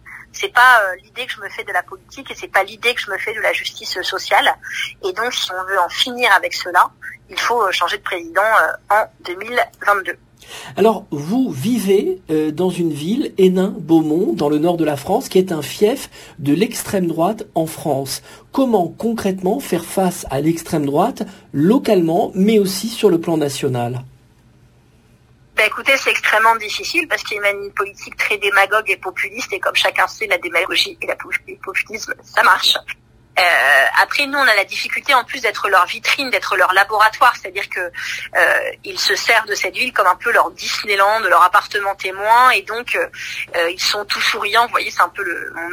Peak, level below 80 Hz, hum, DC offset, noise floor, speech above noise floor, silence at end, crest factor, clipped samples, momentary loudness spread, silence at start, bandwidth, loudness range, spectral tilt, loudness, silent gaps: 0 dBFS; -54 dBFS; none; under 0.1%; -51 dBFS; 34 dB; 0 s; 18 dB; under 0.1%; 11 LU; 0.05 s; 16 kHz; 5 LU; -3.5 dB/octave; -16 LUFS; none